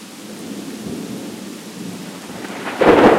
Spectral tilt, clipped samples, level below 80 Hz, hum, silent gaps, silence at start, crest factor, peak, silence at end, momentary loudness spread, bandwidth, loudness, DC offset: -5 dB/octave; under 0.1%; -48 dBFS; none; none; 0 s; 18 dB; -2 dBFS; 0 s; 17 LU; 16 kHz; -21 LUFS; under 0.1%